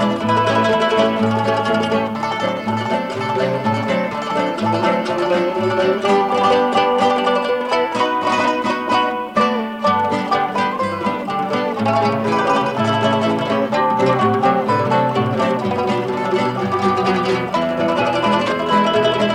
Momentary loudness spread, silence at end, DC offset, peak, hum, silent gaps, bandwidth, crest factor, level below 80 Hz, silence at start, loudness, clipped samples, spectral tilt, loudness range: 5 LU; 0 s; under 0.1%; -4 dBFS; none; none; 16 kHz; 14 dB; -54 dBFS; 0 s; -17 LUFS; under 0.1%; -6 dB/octave; 2 LU